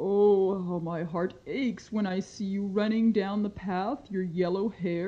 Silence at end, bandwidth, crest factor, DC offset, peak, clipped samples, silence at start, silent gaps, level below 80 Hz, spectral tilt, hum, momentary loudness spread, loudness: 0 s; 7.6 kHz; 16 dB; under 0.1%; -14 dBFS; under 0.1%; 0 s; none; -62 dBFS; -7.5 dB/octave; none; 9 LU; -29 LUFS